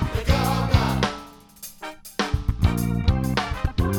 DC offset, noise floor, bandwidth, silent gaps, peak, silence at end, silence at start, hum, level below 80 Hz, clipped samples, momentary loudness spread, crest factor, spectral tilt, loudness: under 0.1%; -43 dBFS; over 20 kHz; none; -4 dBFS; 0 s; 0 s; none; -30 dBFS; under 0.1%; 16 LU; 18 dB; -6 dB/octave; -23 LUFS